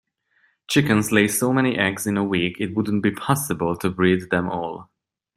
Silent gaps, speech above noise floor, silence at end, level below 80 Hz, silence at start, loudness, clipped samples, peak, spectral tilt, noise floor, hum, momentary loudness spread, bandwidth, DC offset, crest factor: none; 44 dB; 0.55 s; -56 dBFS; 0.7 s; -21 LUFS; under 0.1%; -2 dBFS; -5 dB/octave; -64 dBFS; none; 6 LU; 15.5 kHz; under 0.1%; 20 dB